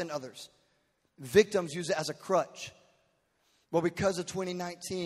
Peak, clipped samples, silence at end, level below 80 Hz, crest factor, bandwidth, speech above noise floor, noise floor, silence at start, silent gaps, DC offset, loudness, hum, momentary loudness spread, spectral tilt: -8 dBFS; under 0.1%; 0 s; -66 dBFS; 24 dB; 15.5 kHz; 42 dB; -74 dBFS; 0 s; none; under 0.1%; -31 LUFS; none; 20 LU; -4.5 dB/octave